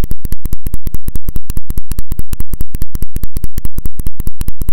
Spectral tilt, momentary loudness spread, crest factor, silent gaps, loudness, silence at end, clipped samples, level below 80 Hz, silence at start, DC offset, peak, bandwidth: -6 dB/octave; 1 LU; 4 dB; none; -25 LUFS; 0 s; 9%; -20 dBFS; 0 s; under 0.1%; 0 dBFS; 17 kHz